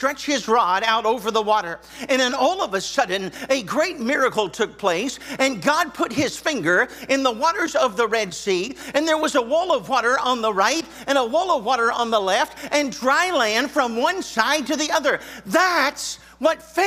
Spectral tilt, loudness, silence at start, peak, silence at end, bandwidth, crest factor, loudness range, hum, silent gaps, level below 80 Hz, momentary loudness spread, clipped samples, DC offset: -2.5 dB/octave; -21 LUFS; 0 s; -2 dBFS; 0 s; 16 kHz; 20 dB; 2 LU; none; none; -58 dBFS; 5 LU; under 0.1%; under 0.1%